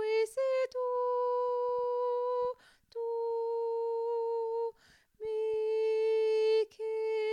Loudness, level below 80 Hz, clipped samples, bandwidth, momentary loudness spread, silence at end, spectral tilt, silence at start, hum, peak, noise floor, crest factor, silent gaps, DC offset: -32 LUFS; -76 dBFS; under 0.1%; 10.5 kHz; 8 LU; 0 s; -2 dB/octave; 0 s; none; -22 dBFS; -63 dBFS; 10 dB; none; under 0.1%